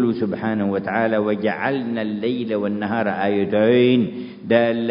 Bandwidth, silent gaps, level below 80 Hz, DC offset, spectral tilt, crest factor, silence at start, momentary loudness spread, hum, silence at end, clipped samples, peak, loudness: 5.4 kHz; none; -58 dBFS; under 0.1%; -11.5 dB/octave; 18 dB; 0 s; 7 LU; none; 0 s; under 0.1%; -2 dBFS; -20 LUFS